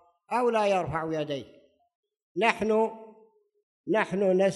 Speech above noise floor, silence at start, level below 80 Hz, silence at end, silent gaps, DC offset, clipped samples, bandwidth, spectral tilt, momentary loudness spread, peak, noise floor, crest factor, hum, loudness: 35 dB; 0.3 s; -62 dBFS; 0 s; 1.95-2.03 s, 2.22-2.35 s, 3.63-3.84 s; under 0.1%; under 0.1%; 12 kHz; -6 dB/octave; 13 LU; -8 dBFS; -61 dBFS; 20 dB; none; -27 LUFS